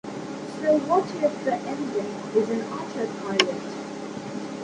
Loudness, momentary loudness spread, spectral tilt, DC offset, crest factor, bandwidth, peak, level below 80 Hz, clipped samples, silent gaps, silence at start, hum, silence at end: -26 LUFS; 12 LU; -4.5 dB/octave; under 0.1%; 24 dB; 11 kHz; -2 dBFS; -68 dBFS; under 0.1%; none; 0.05 s; none; 0 s